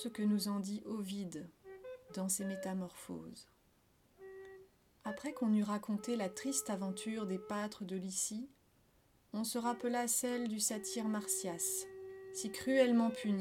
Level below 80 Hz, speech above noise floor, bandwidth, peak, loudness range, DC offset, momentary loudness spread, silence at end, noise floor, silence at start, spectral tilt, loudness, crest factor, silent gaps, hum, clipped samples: -76 dBFS; 34 dB; 19 kHz; -18 dBFS; 8 LU; under 0.1%; 18 LU; 0 s; -71 dBFS; 0 s; -4 dB/octave; -38 LUFS; 20 dB; none; none; under 0.1%